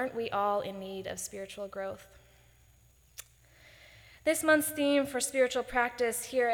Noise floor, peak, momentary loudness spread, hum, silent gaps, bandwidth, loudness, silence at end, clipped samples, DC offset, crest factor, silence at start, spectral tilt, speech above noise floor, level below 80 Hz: -62 dBFS; -12 dBFS; 18 LU; none; none; over 20 kHz; -31 LUFS; 0 s; under 0.1%; under 0.1%; 20 dB; 0 s; -2.5 dB/octave; 32 dB; -62 dBFS